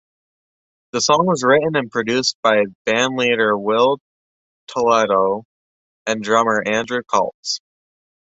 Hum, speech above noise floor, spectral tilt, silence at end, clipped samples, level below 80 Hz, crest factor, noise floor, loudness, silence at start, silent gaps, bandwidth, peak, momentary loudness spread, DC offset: none; over 73 dB; -3.5 dB/octave; 0.8 s; under 0.1%; -62 dBFS; 18 dB; under -90 dBFS; -18 LUFS; 0.95 s; 2.35-2.43 s, 2.75-2.85 s, 4.01-4.67 s, 5.45-6.06 s, 7.34-7.43 s; 8.2 kHz; -2 dBFS; 10 LU; under 0.1%